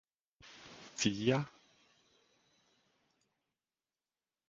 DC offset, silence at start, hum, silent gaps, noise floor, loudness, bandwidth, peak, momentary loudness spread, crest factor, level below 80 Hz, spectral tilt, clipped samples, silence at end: under 0.1%; 0.45 s; none; none; under -90 dBFS; -35 LUFS; 7.4 kHz; -16 dBFS; 22 LU; 26 dB; -74 dBFS; -4.5 dB/octave; under 0.1%; 3 s